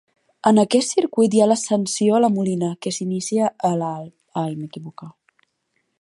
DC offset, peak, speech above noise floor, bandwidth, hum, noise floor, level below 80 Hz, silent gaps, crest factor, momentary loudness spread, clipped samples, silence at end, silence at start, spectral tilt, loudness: under 0.1%; -2 dBFS; 52 dB; 11.5 kHz; none; -71 dBFS; -70 dBFS; none; 20 dB; 15 LU; under 0.1%; 0.9 s; 0.45 s; -5.5 dB/octave; -20 LUFS